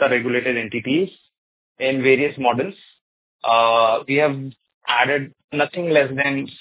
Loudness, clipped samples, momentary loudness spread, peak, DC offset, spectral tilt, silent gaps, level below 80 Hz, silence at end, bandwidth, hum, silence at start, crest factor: -19 LUFS; under 0.1%; 12 LU; -2 dBFS; under 0.1%; -9 dB/octave; 1.38-1.75 s, 3.01-3.39 s, 4.74-4.81 s, 5.44-5.48 s; -64 dBFS; 0.05 s; 4 kHz; none; 0 s; 18 dB